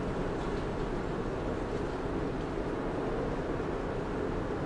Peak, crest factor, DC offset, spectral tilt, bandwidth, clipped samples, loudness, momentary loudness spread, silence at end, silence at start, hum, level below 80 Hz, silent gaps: -22 dBFS; 12 dB; under 0.1%; -7.5 dB/octave; 11 kHz; under 0.1%; -35 LUFS; 1 LU; 0 s; 0 s; none; -42 dBFS; none